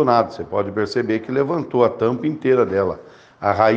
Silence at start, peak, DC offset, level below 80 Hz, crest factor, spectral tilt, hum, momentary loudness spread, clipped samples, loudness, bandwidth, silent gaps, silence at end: 0 s; 0 dBFS; under 0.1%; -58 dBFS; 18 dB; -7.5 dB/octave; none; 7 LU; under 0.1%; -20 LUFS; 7.8 kHz; none; 0 s